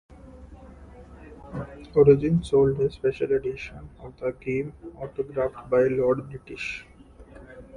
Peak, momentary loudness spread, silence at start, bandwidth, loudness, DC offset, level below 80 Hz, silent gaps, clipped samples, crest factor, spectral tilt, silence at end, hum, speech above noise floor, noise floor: -4 dBFS; 20 LU; 0.25 s; 9.8 kHz; -24 LUFS; under 0.1%; -48 dBFS; none; under 0.1%; 22 dB; -8 dB/octave; 0 s; none; 23 dB; -48 dBFS